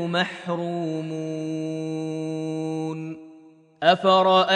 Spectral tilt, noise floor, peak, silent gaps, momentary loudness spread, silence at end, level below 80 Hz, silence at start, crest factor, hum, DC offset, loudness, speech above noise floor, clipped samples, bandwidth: -5.5 dB/octave; -50 dBFS; -4 dBFS; none; 13 LU; 0 s; -76 dBFS; 0 s; 20 dB; none; under 0.1%; -24 LUFS; 27 dB; under 0.1%; 9.8 kHz